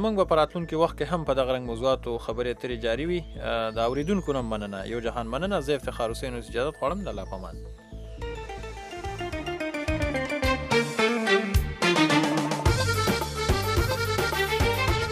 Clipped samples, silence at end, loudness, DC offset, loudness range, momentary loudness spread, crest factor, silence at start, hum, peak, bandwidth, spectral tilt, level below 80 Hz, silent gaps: under 0.1%; 0 s; -26 LUFS; under 0.1%; 9 LU; 13 LU; 18 dB; 0 s; none; -8 dBFS; 15.5 kHz; -5 dB/octave; -36 dBFS; none